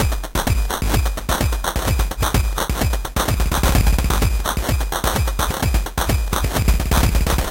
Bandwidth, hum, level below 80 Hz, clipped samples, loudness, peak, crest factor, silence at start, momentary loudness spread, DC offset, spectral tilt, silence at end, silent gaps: 17 kHz; none; -20 dBFS; under 0.1%; -20 LUFS; -2 dBFS; 16 dB; 0 s; 4 LU; under 0.1%; -4.5 dB/octave; 0 s; none